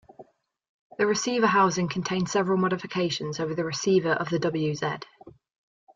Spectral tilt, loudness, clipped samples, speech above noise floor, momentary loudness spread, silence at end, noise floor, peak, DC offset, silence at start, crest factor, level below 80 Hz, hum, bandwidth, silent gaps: -5 dB/octave; -25 LUFS; under 0.1%; 29 dB; 8 LU; 0.65 s; -54 dBFS; -10 dBFS; under 0.1%; 0.2 s; 16 dB; -64 dBFS; none; 7.6 kHz; 0.69-0.90 s